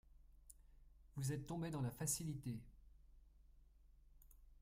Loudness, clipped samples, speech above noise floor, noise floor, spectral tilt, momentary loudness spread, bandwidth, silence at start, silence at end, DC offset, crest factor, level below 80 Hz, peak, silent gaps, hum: -46 LUFS; under 0.1%; 23 dB; -67 dBFS; -5 dB/octave; 24 LU; 16 kHz; 0.1 s; 0.05 s; under 0.1%; 22 dB; -64 dBFS; -28 dBFS; none; none